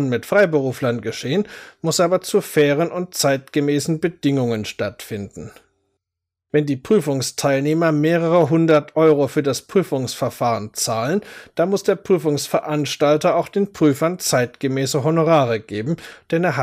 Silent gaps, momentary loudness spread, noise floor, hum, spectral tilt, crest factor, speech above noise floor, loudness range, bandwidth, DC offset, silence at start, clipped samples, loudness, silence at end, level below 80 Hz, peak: none; 9 LU; -84 dBFS; none; -5 dB/octave; 14 dB; 65 dB; 5 LU; 16 kHz; under 0.1%; 0 s; under 0.1%; -19 LUFS; 0 s; -60 dBFS; -4 dBFS